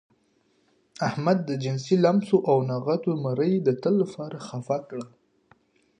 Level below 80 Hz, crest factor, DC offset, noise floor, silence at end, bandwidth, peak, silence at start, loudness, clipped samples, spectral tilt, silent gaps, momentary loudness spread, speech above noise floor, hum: -72 dBFS; 18 dB; under 0.1%; -67 dBFS; 0.9 s; 10 kHz; -8 dBFS; 1 s; -25 LUFS; under 0.1%; -7.5 dB/octave; none; 14 LU; 43 dB; none